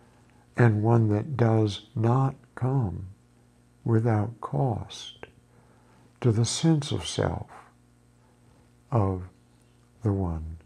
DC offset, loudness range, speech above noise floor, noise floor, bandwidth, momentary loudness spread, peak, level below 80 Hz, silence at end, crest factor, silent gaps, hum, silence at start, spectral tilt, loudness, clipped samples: under 0.1%; 7 LU; 35 dB; -59 dBFS; 10.5 kHz; 16 LU; -8 dBFS; -52 dBFS; 0.1 s; 20 dB; none; 60 Hz at -50 dBFS; 0.55 s; -6.5 dB/octave; -26 LUFS; under 0.1%